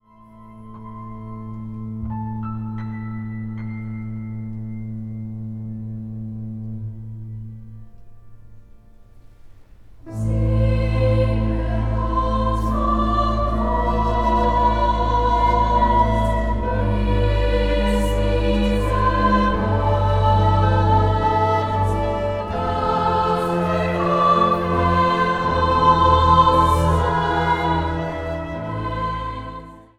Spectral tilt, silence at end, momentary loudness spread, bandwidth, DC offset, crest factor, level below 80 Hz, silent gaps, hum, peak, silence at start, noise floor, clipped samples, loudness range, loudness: -7.5 dB/octave; 0.2 s; 15 LU; 11.5 kHz; under 0.1%; 18 dB; -26 dBFS; none; none; -2 dBFS; 0.35 s; -45 dBFS; under 0.1%; 15 LU; -20 LUFS